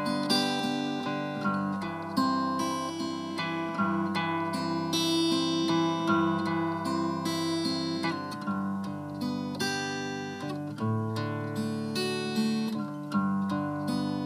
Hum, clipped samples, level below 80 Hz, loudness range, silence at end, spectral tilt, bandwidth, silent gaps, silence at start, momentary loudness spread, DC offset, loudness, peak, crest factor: none; under 0.1%; -74 dBFS; 5 LU; 0 s; -5 dB/octave; 15.5 kHz; none; 0 s; 7 LU; under 0.1%; -30 LUFS; -12 dBFS; 18 dB